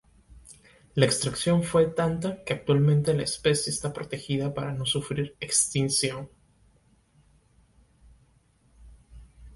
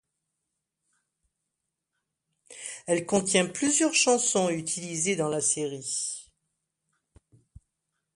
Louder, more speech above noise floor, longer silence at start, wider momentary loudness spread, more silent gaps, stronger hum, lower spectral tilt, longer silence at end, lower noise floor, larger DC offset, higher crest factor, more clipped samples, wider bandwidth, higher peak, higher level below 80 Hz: about the same, -26 LUFS vs -25 LUFS; second, 38 dB vs 58 dB; second, 0.3 s vs 2.5 s; second, 9 LU vs 13 LU; neither; neither; first, -4.5 dB/octave vs -2.5 dB/octave; second, 0 s vs 1.95 s; second, -63 dBFS vs -84 dBFS; neither; about the same, 22 dB vs 22 dB; neither; about the same, 12 kHz vs 11.5 kHz; first, -6 dBFS vs -10 dBFS; first, -54 dBFS vs -68 dBFS